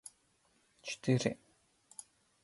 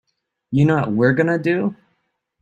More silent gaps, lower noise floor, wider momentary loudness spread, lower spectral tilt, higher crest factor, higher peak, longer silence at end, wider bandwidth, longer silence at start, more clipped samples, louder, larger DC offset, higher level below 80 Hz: neither; about the same, -73 dBFS vs -70 dBFS; first, 20 LU vs 7 LU; second, -5.5 dB/octave vs -9 dB/octave; first, 24 dB vs 16 dB; second, -16 dBFS vs -4 dBFS; first, 1.1 s vs 0.7 s; first, 11.5 kHz vs 7.8 kHz; first, 0.85 s vs 0.5 s; neither; second, -35 LUFS vs -18 LUFS; neither; second, -74 dBFS vs -52 dBFS